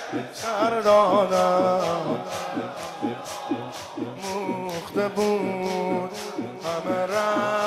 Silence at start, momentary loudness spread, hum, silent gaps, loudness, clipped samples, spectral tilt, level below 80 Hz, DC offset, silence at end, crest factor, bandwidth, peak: 0 s; 13 LU; none; none; -25 LUFS; under 0.1%; -5 dB/octave; -66 dBFS; under 0.1%; 0 s; 16 dB; 15.5 kHz; -8 dBFS